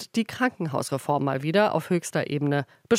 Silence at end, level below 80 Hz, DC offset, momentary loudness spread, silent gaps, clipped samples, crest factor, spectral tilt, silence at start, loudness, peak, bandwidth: 0 s; -70 dBFS; under 0.1%; 6 LU; none; under 0.1%; 16 dB; -5.5 dB/octave; 0 s; -26 LUFS; -8 dBFS; 16 kHz